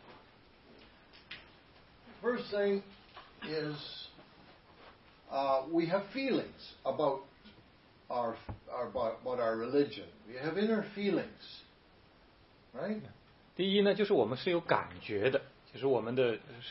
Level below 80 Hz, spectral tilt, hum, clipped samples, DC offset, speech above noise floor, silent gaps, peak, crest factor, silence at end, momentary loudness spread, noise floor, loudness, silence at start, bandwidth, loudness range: -68 dBFS; -9 dB/octave; none; under 0.1%; under 0.1%; 29 dB; none; -12 dBFS; 24 dB; 0 s; 19 LU; -62 dBFS; -34 LUFS; 0 s; 5.8 kHz; 6 LU